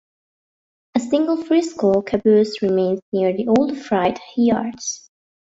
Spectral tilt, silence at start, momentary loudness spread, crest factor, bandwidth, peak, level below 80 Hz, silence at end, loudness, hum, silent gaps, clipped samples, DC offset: -5.5 dB/octave; 0.95 s; 9 LU; 14 dB; 8 kHz; -4 dBFS; -58 dBFS; 0.6 s; -19 LUFS; none; 3.02-3.12 s; under 0.1%; under 0.1%